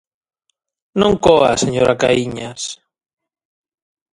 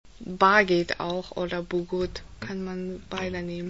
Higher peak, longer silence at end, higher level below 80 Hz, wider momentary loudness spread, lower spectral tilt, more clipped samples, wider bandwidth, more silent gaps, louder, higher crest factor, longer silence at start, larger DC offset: first, 0 dBFS vs -6 dBFS; first, 1.4 s vs 0 s; first, -44 dBFS vs -50 dBFS; about the same, 15 LU vs 15 LU; about the same, -4.5 dB/octave vs -5.5 dB/octave; neither; first, 11.5 kHz vs 8 kHz; neither; first, -15 LUFS vs -26 LUFS; about the same, 18 dB vs 22 dB; first, 0.95 s vs 0.15 s; second, under 0.1% vs 0.3%